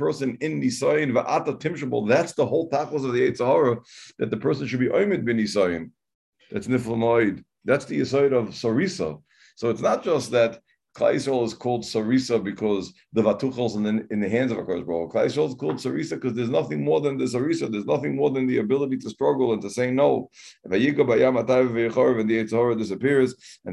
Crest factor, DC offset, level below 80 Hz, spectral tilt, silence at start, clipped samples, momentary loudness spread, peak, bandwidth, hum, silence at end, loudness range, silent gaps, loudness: 18 dB; under 0.1%; -60 dBFS; -6 dB/octave; 0 s; under 0.1%; 7 LU; -6 dBFS; 12 kHz; none; 0 s; 3 LU; 6.15-6.33 s; -23 LUFS